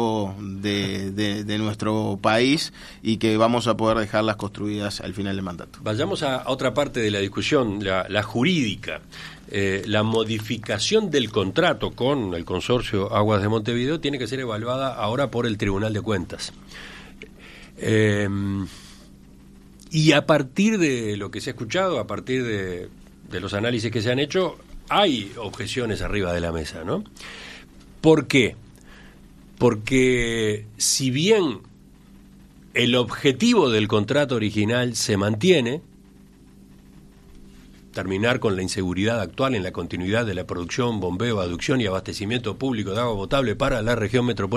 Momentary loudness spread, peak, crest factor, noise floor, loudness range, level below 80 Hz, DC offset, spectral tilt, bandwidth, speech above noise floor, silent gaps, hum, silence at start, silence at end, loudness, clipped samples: 12 LU; -4 dBFS; 20 dB; -49 dBFS; 4 LU; -46 dBFS; under 0.1%; -5 dB/octave; 13.5 kHz; 27 dB; none; none; 0 s; 0 s; -23 LUFS; under 0.1%